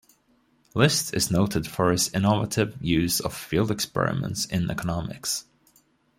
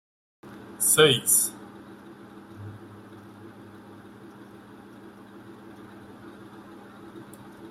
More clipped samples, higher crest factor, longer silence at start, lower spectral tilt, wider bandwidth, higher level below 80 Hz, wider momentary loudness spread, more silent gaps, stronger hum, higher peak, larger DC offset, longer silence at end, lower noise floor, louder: neither; second, 20 dB vs 26 dB; first, 0.75 s vs 0.45 s; first, -4.5 dB/octave vs -2 dB/octave; about the same, 16.5 kHz vs 16 kHz; first, -50 dBFS vs -68 dBFS; second, 7 LU vs 28 LU; neither; neither; about the same, -6 dBFS vs -4 dBFS; neither; first, 0.75 s vs 0 s; first, -65 dBFS vs -47 dBFS; second, -25 LUFS vs -20 LUFS